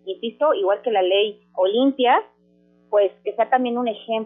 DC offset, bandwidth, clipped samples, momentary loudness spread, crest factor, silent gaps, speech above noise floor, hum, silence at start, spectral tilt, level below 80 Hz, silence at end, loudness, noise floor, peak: under 0.1%; 3.9 kHz; under 0.1%; 6 LU; 16 dB; none; 38 dB; 60 Hz at -60 dBFS; 0.05 s; -8 dB/octave; -78 dBFS; 0 s; -21 LUFS; -58 dBFS; -6 dBFS